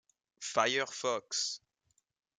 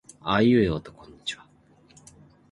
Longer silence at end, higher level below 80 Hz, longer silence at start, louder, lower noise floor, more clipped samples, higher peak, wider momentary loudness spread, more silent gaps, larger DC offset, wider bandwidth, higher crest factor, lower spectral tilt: second, 0.8 s vs 1.15 s; second, -84 dBFS vs -50 dBFS; first, 0.4 s vs 0.25 s; second, -33 LUFS vs -24 LUFS; first, -78 dBFS vs -58 dBFS; neither; second, -12 dBFS vs -8 dBFS; second, 11 LU vs 15 LU; neither; neither; about the same, 11.5 kHz vs 11.5 kHz; about the same, 24 dB vs 20 dB; second, -1 dB/octave vs -6.5 dB/octave